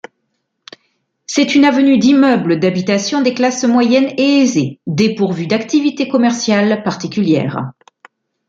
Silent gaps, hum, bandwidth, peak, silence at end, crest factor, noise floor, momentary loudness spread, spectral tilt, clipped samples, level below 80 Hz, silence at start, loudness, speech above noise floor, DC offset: none; none; 7.8 kHz; -2 dBFS; 0.75 s; 12 dB; -69 dBFS; 8 LU; -5 dB/octave; under 0.1%; -60 dBFS; 1.3 s; -13 LUFS; 56 dB; under 0.1%